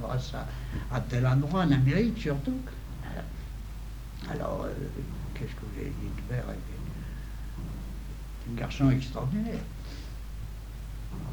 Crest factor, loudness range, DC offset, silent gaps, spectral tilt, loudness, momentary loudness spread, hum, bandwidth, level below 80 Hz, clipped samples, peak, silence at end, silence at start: 20 dB; 9 LU; under 0.1%; none; -7.5 dB/octave; -33 LUFS; 16 LU; none; over 20 kHz; -38 dBFS; under 0.1%; -12 dBFS; 0 s; 0 s